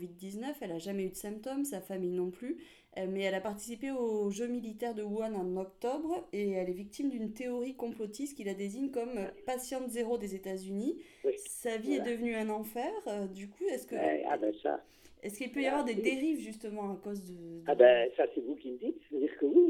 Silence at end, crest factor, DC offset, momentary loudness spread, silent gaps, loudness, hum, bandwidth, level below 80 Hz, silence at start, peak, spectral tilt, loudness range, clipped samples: 0 s; 24 dB; under 0.1%; 9 LU; none; -35 LUFS; none; 17 kHz; -70 dBFS; 0 s; -10 dBFS; -5 dB/octave; 7 LU; under 0.1%